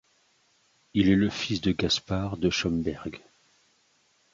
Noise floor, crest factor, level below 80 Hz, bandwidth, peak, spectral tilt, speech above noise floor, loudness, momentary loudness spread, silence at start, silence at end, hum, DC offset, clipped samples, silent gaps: -67 dBFS; 18 dB; -48 dBFS; 7.8 kHz; -10 dBFS; -5 dB/octave; 41 dB; -27 LUFS; 13 LU; 0.95 s; 1.15 s; none; under 0.1%; under 0.1%; none